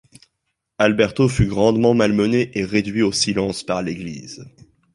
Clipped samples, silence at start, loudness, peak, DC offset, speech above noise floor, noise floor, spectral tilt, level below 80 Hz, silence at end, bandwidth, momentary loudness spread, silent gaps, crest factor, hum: under 0.1%; 0.8 s; -18 LUFS; -2 dBFS; under 0.1%; 57 dB; -76 dBFS; -5.5 dB/octave; -40 dBFS; 0.45 s; 11.5 kHz; 14 LU; none; 18 dB; none